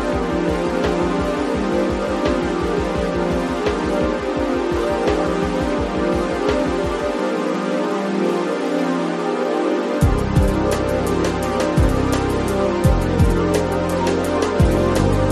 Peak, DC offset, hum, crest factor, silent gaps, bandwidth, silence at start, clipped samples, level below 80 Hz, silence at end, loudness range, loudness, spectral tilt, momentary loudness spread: -2 dBFS; under 0.1%; none; 16 dB; none; 13.5 kHz; 0 s; under 0.1%; -28 dBFS; 0 s; 2 LU; -19 LUFS; -6.5 dB/octave; 4 LU